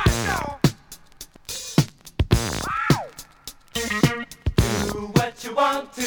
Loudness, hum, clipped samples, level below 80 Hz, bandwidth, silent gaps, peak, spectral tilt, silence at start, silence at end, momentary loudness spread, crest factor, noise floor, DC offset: -23 LUFS; none; under 0.1%; -34 dBFS; over 20 kHz; none; -2 dBFS; -5 dB/octave; 0 s; 0 s; 17 LU; 22 dB; -45 dBFS; under 0.1%